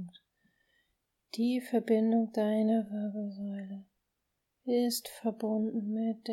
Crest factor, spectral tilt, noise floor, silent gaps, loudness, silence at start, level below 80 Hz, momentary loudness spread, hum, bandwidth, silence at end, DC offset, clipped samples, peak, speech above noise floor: 16 dB; -6 dB/octave; -83 dBFS; none; -32 LUFS; 0 s; -82 dBFS; 15 LU; none; 16.5 kHz; 0 s; under 0.1%; under 0.1%; -16 dBFS; 52 dB